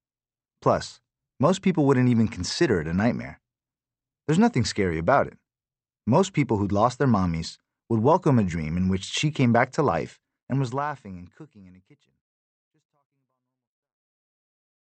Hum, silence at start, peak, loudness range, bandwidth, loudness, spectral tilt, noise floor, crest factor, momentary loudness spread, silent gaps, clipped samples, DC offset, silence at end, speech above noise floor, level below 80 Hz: none; 0.65 s; -6 dBFS; 8 LU; 8.8 kHz; -24 LUFS; -6.5 dB/octave; under -90 dBFS; 20 dB; 13 LU; 10.42-10.47 s; under 0.1%; under 0.1%; 3.25 s; over 67 dB; -52 dBFS